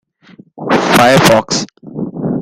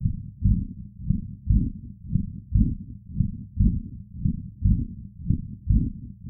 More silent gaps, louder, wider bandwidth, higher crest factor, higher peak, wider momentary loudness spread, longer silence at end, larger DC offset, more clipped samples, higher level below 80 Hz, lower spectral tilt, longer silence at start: neither; first, -11 LUFS vs -27 LUFS; first, 17.5 kHz vs 0.5 kHz; second, 12 dB vs 18 dB; first, 0 dBFS vs -8 dBFS; first, 18 LU vs 12 LU; about the same, 0 s vs 0 s; neither; neither; second, -44 dBFS vs -28 dBFS; second, -4 dB/octave vs -16.5 dB/octave; first, 0.55 s vs 0 s